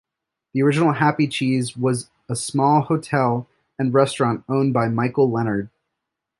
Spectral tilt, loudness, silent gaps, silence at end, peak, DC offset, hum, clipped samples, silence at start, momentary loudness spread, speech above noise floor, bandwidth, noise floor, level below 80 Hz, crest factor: -6 dB/octave; -20 LUFS; none; 0.75 s; -2 dBFS; under 0.1%; none; under 0.1%; 0.55 s; 10 LU; 62 dB; 11.5 kHz; -81 dBFS; -60 dBFS; 18 dB